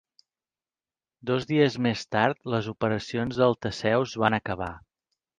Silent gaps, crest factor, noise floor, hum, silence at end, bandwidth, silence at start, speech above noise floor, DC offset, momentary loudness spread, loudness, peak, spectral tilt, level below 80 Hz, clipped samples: none; 20 dB; under -90 dBFS; none; 0.6 s; 9.6 kHz; 1.25 s; over 64 dB; under 0.1%; 7 LU; -26 LUFS; -6 dBFS; -6 dB/octave; -56 dBFS; under 0.1%